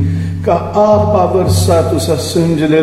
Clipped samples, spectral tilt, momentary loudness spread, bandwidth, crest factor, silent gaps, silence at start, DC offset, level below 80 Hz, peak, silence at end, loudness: under 0.1%; -6.5 dB/octave; 5 LU; 14.5 kHz; 10 dB; none; 0 s; under 0.1%; -36 dBFS; 0 dBFS; 0 s; -12 LUFS